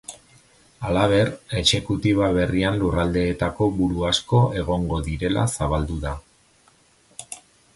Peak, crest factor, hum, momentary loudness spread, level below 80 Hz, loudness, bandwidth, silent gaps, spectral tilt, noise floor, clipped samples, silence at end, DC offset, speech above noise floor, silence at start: -4 dBFS; 18 dB; none; 18 LU; -36 dBFS; -22 LUFS; 11.5 kHz; none; -5.5 dB/octave; -58 dBFS; under 0.1%; 0.4 s; under 0.1%; 37 dB; 0.1 s